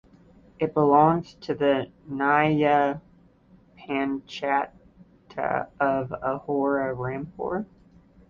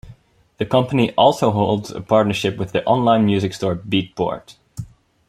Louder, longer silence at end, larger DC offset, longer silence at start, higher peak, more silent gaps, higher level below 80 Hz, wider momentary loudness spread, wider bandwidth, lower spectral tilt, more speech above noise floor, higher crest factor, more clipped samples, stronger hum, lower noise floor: second, -25 LUFS vs -18 LUFS; first, 0.65 s vs 0.45 s; neither; first, 0.6 s vs 0.05 s; second, -6 dBFS vs -2 dBFS; neither; second, -58 dBFS vs -50 dBFS; second, 13 LU vs 16 LU; second, 7.2 kHz vs 14.5 kHz; first, -8 dB/octave vs -6.5 dB/octave; about the same, 32 dB vs 31 dB; about the same, 20 dB vs 18 dB; neither; neither; first, -56 dBFS vs -48 dBFS